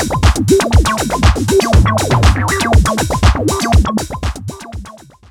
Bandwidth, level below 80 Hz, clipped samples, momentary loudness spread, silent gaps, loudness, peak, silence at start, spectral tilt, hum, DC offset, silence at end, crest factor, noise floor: 17 kHz; -18 dBFS; under 0.1%; 13 LU; none; -13 LUFS; 0 dBFS; 0 s; -5 dB/octave; none; under 0.1%; 0.35 s; 12 dB; -35 dBFS